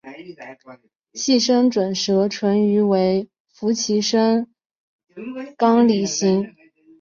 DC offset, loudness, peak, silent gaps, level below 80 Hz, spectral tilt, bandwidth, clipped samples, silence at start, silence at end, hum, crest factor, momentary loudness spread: under 0.1%; -19 LUFS; -4 dBFS; 0.96-1.00 s, 3.40-3.45 s, 4.66-4.70 s, 4.77-4.99 s; -64 dBFS; -5 dB/octave; 7.4 kHz; under 0.1%; 0.05 s; 0.5 s; none; 16 dB; 21 LU